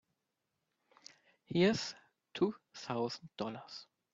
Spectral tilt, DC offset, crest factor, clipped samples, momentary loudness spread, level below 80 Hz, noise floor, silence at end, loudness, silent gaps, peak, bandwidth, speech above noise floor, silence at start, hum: -5.5 dB/octave; under 0.1%; 22 dB; under 0.1%; 25 LU; -76 dBFS; -86 dBFS; 0.3 s; -36 LUFS; none; -18 dBFS; 7.8 kHz; 50 dB; 1.5 s; none